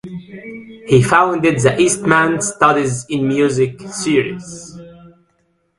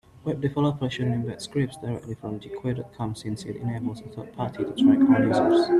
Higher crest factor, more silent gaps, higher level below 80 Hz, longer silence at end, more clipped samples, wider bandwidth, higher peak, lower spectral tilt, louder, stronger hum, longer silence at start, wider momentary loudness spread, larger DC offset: about the same, 16 dB vs 18 dB; neither; first, -50 dBFS vs -56 dBFS; first, 0.7 s vs 0 s; neither; about the same, 11.5 kHz vs 11.5 kHz; first, 0 dBFS vs -8 dBFS; second, -5 dB/octave vs -7.5 dB/octave; first, -15 LUFS vs -25 LUFS; neither; second, 0.05 s vs 0.25 s; first, 20 LU vs 15 LU; neither